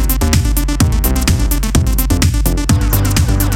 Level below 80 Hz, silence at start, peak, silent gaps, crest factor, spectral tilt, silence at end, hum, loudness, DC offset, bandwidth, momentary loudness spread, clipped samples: -16 dBFS; 0 s; 0 dBFS; none; 12 dB; -5 dB/octave; 0 s; none; -14 LUFS; under 0.1%; 18 kHz; 2 LU; under 0.1%